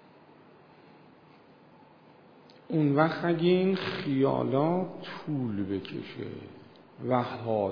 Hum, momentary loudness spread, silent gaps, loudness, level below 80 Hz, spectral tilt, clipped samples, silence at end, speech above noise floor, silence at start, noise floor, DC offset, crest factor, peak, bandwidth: none; 15 LU; none; -29 LUFS; -72 dBFS; -9 dB/octave; under 0.1%; 0 s; 28 dB; 2.7 s; -56 dBFS; under 0.1%; 22 dB; -8 dBFS; 5.2 kHz